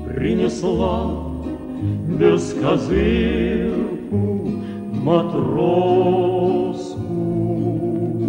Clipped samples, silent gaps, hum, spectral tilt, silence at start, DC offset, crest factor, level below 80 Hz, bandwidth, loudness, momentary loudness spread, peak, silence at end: under 0.1%; none; none; -7.5 dB/octave; 0 s; under 0.1%; 18 dB; -34 dBFS; 9.6 kHz; -20 LUFS; 9 LU; -2 dBFS; 0 s